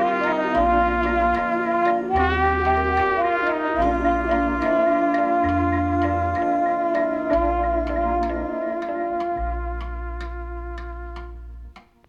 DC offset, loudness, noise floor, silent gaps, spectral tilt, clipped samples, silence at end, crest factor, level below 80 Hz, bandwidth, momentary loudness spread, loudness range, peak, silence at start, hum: under 0.1%; -21 LUFS; -43 dBFS; none; -8 dB/octave; under 0.1%; 0.3 s; 14 dB; -34 dBFS; 7.2 kHz; 14 LU; 7 LU; -8 dBFS; 0 s; none